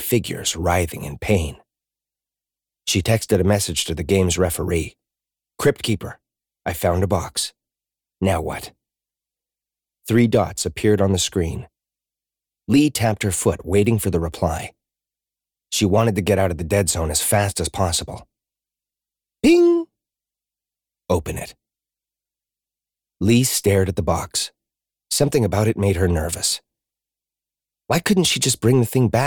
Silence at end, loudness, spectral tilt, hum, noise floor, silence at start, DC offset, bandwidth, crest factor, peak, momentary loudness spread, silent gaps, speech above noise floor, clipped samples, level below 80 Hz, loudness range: 0 s; -20 LUFS; -4.5 dB/octave; 50 Hz at -45 dBFS; -89 dBFS; 0 s; under 0.1%; over 20 kHz; 16 dB; -6 dBFS; 12 LU; none; 69 dB; under 0.1%; -40 dBFS; 4 LU